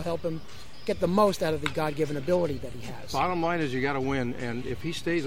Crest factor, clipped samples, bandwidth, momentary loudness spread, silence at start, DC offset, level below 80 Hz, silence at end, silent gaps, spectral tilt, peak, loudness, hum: 18 dB; under 0.1%; 16 kHz; 13 LU; 0 s; 1%; -50 dBFS; 0 s; none; -6 dB/octave; -10 dBFS; -28 LUFS; none